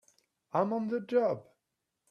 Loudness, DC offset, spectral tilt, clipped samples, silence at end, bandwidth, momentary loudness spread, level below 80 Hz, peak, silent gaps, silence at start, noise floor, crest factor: -32 LUFS; under 0.1%; -8 dB/octave; under 0.1%; 0.7 s; 7 kHz; 6 LU; -80 dBFS; -14 dBFS; none; 0.55 s; -85 dBFS; 20 dB